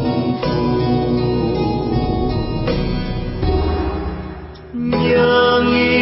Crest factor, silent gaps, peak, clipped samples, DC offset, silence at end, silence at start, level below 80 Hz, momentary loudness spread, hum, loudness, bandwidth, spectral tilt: 14 dB; none; -4 dBFS; under 0.1%; under 0.1%; 0 s; 0 s; -28 dBFS; 12 LU; none; -18 LUFS; 5.8 kHz; -10 dB/octave